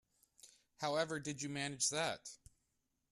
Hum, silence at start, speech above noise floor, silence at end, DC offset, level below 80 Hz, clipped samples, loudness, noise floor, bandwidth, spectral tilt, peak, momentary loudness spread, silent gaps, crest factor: none; 0.45 s; 44 dB; 0.75 s; under 0.1%; -76 dBFS; under 0.1%; -39 LUFS; -84 dBFS; 13.5 kHz; -2.5 dB/octave; -22 dBFS; 14 LU; none; 20 dB